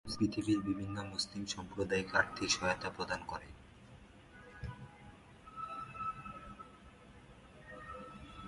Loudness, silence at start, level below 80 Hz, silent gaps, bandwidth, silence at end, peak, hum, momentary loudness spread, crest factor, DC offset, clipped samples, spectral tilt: -38 LUFS; 0.05 s; -60 dBFS; none; 11.5 kHz; 0 s; -16 dBFS; none; 25 LU; 24 dB; under 0.1%; under 0.1%; -4 dB/octave